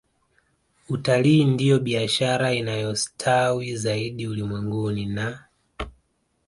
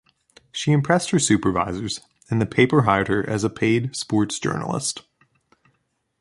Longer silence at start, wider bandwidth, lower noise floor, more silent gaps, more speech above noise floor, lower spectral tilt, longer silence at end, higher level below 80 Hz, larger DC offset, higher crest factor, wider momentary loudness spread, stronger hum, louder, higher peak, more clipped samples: first, 0.9 s vs 0.55 s; about the same, 11.5 kHz vs 11.5 kHz; about the same, -69 dBFS vs -71 dBFS; neither; second, 46 dB vs 50 dB; about the same, -5.5 dB/octave vs -5 dB/octave; second, 0.55 s vs 1.2 s; about the same, -50 dBFS vs -50 dBFS; neither; about the same, 18 dB vs 20 dB; first, 13 LU vs 10 LU; neither; about the same, -23 LUFS vs -21 LUFS; second, -6 dBFS vs -2 dBFS; neither